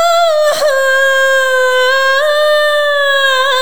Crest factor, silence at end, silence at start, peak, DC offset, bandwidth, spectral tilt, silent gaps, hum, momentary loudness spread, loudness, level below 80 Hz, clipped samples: 8 dB; 0 s; 0 s; -2 dBFS; 4%; over 20 kHz; 1.5 dB/octave; none; none; 2 LU; -10 LUFS; -62 dBFS; under 0.1%